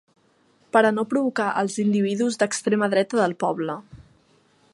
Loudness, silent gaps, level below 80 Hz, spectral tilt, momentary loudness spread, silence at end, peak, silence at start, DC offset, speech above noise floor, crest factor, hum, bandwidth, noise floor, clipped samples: -22 LUFS; none; -66 dBFS; -5 dB/octave; 6 LU; 0.75 s; -2 dBFS; 0.75 s; under 0.1%; 39 dB; 20 dB; none; 11.5 kHz; -61 dBFS; under 0.1%